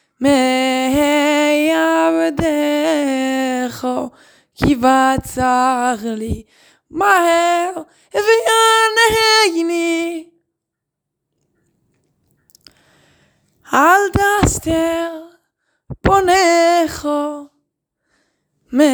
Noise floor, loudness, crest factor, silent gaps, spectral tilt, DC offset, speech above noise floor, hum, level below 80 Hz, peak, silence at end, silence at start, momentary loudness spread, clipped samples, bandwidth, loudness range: -80 dBFS; -15 LUFS; 16 dB; none; -3.5 dB/octave; under 0.1%; 65 dB; none; -38 dBFS; 0 dBFS; 0 s; 0.2 s; 13 LU; under 0.1%; over 20 kHz; 5 LU